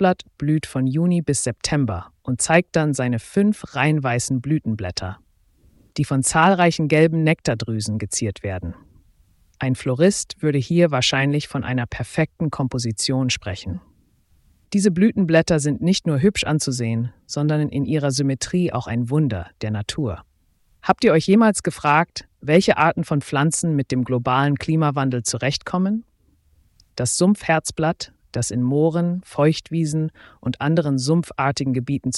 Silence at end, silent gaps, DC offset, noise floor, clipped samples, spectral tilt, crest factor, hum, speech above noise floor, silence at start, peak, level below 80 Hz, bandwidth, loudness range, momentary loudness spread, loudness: 0 s; none; under 0.1%; -61 dBFS; under 0.1%; -5.5 dB/octave; 20 dB; none; 41 dB; 0 s; 0 dBFS; -48 dBFS; 12 kHz; 4 LU; 10 LU; -20 LUFS